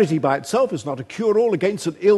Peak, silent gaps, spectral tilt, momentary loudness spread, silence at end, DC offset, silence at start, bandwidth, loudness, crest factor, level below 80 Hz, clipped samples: -4 dBFS; none; -6 dB/octave; 7 LU; 0 s; under 0.1%; 0 s; 12.5 kHz; -21 LUFS; 14 dB; -64 dBFS; under 0.1%